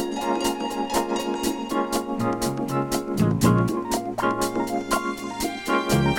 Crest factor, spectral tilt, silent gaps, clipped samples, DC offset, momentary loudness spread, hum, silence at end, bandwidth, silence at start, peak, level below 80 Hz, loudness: 18 dB; -5 dB/octave; none; under 0.1%; under 0.1%; 6 LU; none; 0 s; 19 kHz; 0 s; -6 dBFS; -46 dBFS; -24 LUFS